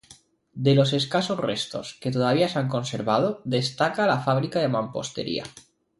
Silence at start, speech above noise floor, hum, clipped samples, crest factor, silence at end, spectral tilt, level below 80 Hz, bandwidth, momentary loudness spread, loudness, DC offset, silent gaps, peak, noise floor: 0.1 s; 30 dB; none; under 0.1%; 18 dB; 0.4 s; -5.5 dB/octave; -62 dBFS; 11.5 kHz; 10 LU; -24 LUFS; under 0.1%; none; -6 dBFS; -54 dBFS